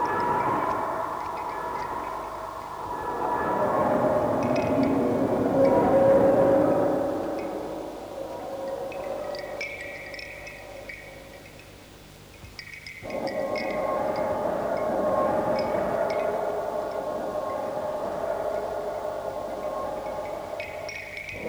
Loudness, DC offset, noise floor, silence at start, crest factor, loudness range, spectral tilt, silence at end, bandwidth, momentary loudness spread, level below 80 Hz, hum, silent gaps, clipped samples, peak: -27 LUFS; under 0.1%; -47 dBFS; 0 s; 18 dB; 14 LU; -6.5 dB/octave; 0 s; over 20 kHz; 18 LU; -54 dBFS; 50 Hz at -55 dBFS; none; under 0.1%; -8 dBFS